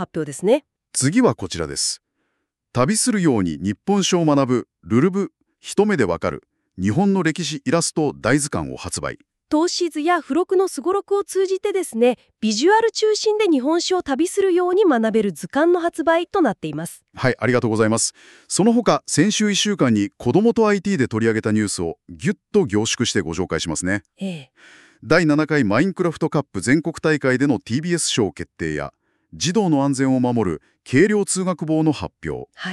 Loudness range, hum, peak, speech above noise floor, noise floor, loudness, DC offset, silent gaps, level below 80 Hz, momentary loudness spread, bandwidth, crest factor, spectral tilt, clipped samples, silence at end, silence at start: 3 LU; none; -4 dBFS; 55 dB; -74 dBFS; -20 LUFS; under 0.1%; none; -52 dBFS; 10 LU; 13.5 kHz; 16 dB; -4.5 dB/octave; under 0.1%; 0 s; 0 s